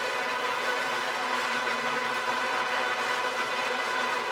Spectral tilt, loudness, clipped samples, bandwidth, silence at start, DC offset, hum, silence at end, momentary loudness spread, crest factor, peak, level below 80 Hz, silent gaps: -1 dB/octave; -28 LUFS; under 0.1%; 19 kHz; 0 s; under 0.1%; none; 0 s; 1 LU; 14 dB; -14 dBFS; -72 dBFS; none